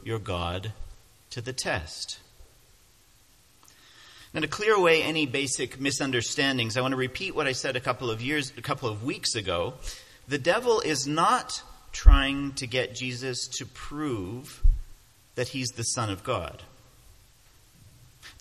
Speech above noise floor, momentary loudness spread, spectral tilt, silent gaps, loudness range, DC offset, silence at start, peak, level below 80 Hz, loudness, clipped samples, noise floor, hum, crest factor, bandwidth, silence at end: 33 dB; 15 LU; -4 dB/octave; none; 9 LU; under 0.1%; 0 s; 0 dBFS; -32 dBFS; -27 LUFS; under 0.1%; -60 dBFS; none; 28 dB; 14 kHz; 0.1 s